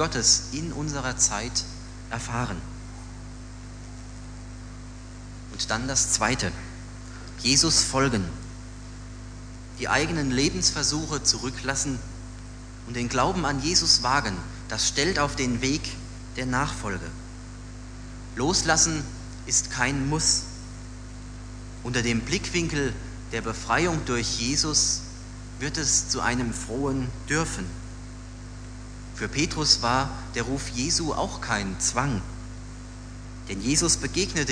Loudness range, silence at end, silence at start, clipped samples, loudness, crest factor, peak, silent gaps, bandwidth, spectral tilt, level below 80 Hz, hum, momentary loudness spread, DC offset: 6 LU; 0 s; 0 s; under 0.1%; -24 LUFS; 22 dB; -6 dBFS; none; 11 kHz; -2.5 dB/octave; -40 dBFS; 50 Hz at -40 dBFS; 21 LU; under 0.1%